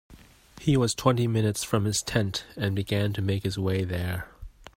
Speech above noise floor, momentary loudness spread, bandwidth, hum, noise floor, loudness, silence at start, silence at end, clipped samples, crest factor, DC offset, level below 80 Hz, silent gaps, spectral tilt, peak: 25 dB; 7 LU; 16 kHz; none; -51 dBFS; -27 LUFS; 0.1 s; 0.05 s; under 0.1%; 20 dB; under 0.1%; -50 dBFS; none; -5.5 dB/octave; -6 dBFS